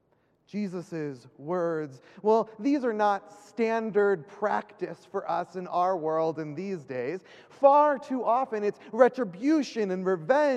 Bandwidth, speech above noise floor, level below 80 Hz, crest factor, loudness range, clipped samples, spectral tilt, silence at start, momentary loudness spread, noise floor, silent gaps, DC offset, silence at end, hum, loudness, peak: 9.8 kHz; 40 dB; -80 dBFS; 22 dB; 4 LU; under 0.1%; -6.5 dB/octave; 0.55 s; 12 LU; -67 dBFS; none; under 0.1%; 0 s; none; -27 LUFS; -6 dBFS